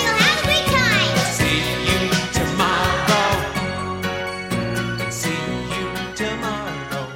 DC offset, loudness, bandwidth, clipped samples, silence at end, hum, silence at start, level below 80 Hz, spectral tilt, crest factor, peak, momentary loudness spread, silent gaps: under 0.1%; -20 LUFS; 16.5 kHz; under 0.1%; 0 s; none; 0 s; -38 dBFS; -3.5 dB/octave; 20 dB; 0 dBFS; 9 LU; none